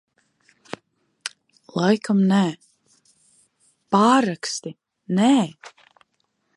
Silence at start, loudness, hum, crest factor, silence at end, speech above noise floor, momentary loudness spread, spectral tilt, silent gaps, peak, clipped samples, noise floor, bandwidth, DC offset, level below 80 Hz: 1.25 s; -20 LUFS; none; 20 dB; 0.9 s; 52 dB; 22 LU; -5.5 dB/octave; none; -2 dBFS; under 0.1%; -71 dBFS; 11.5 kHz; under 0.1%; -74 dBFS